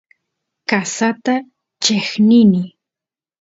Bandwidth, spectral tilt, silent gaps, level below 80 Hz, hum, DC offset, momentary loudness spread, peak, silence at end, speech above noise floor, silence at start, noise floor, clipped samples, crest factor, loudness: 8 kHz; -4.5 dB/octave; none; -60 dBFS; none; under 0.1%; 11 LU; 0 dBFS; 0.75 s; 75 dB; 0.7 s; -89 dBFS; under 0.1%; 16 dB; -15 LUFS